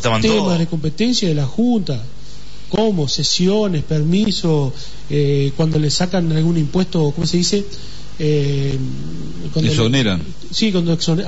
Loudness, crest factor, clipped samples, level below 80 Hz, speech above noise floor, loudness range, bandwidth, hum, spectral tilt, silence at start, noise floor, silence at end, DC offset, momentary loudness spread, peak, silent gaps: -17 LUFS; 12 dB; under 0.1%; -38 dBFS; 20 dB; 2 LU; 8 kHz; none; -5.5 dB/octave; 0 s; -37 dBFS; 0 s; 6%; 10 LU; -4 dBFS; none